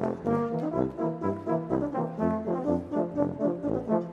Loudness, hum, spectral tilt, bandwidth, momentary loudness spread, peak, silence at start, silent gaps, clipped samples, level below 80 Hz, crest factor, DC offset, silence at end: -29 LUFS; none; -10 dB/octave; 8.2 kHz; 2 LU; -10 dBFS; 0 s; none; under 0.1%; -56 dBFS; 18 dB; under 0.1%; 0 s